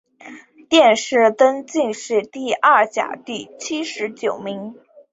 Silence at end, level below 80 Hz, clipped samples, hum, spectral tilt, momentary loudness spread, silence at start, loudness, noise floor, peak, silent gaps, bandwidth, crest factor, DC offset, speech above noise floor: 0.4 s; -68 dBFS; under 0.1%; none; -3 dB/octave; 15 LU; 0.25 s; -18 LUFS; -41 dBFS; -2 dBFS; none; 8 kHz; 18 dB; under 0.1%; 23 dB